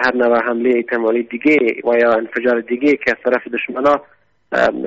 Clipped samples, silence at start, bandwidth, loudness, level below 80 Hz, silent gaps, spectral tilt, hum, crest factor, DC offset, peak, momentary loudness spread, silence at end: under 0.1%; 0 s; 7.8 kHz; -16 LUFS; -56 dBFS; none; -3 dB/octave; none; 14 dB; under 0.1%; -2 dBFS; 4 LU; 0 s